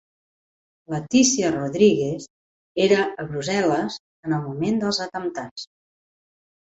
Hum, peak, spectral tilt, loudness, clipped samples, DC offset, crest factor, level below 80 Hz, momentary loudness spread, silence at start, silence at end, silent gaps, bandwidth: none; -4 dBFS; -4 dB/octave; -22 LUFS; under 0.1%; under 0.1%; 20 dB; -60 dBFS; 15 LU; 0.9 s; 1 s; 2.30-2.75 s, 4.00-4.23 s, 5.51-5.56 s; 8.2 kHz